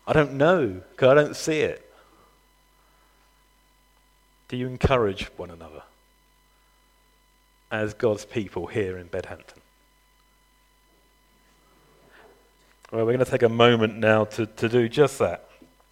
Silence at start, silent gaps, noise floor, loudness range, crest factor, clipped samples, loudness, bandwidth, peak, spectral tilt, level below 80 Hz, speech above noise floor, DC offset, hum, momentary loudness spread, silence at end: 0.05 s; none; -62 dBFS; 13 LU; 24 dB; under 0.1%; -23 LUFS; 16 kHz; -2 dBFS; -6 dB/octave; -48 dBFS; 39 dB; under 0.1%; none; 18 LU; 0.55 s